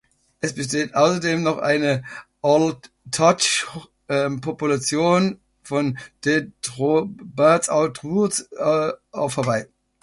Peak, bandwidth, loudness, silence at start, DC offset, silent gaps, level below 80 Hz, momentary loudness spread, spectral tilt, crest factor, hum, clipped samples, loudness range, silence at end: -2 dBFS; 11.5 kHz; -21 LUFS; 0.45 s; under 0.1%; none; -60 dBFS; 10 LU; -4.5 dB/octave; 18 dB; none; under 0.1%; 2 LU; 0.4 s